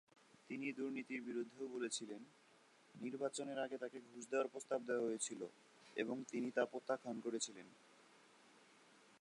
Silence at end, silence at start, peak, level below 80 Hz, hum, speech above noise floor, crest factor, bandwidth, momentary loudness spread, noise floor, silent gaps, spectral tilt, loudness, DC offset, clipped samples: 0.05 s; 0.5 s; -24 dBFS; under -90 dBFS; none; 25 dB; 22 dB; 11 kHz; 12 LU; -70 dBFS; none; -3 dB/octave; -45 LUFS; under 0.1%; under 0.1%